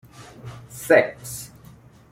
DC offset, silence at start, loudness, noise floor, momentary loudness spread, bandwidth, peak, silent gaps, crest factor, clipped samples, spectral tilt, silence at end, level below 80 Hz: under 0.1%; 0.2 s; -20 LUFS; -48 dBFS; 23 LU; 16.5 kHz; -2 dBFS; none; 22 dB; under 0.1%; -4.5 dB/octave; 0.65 s; -58 dBFS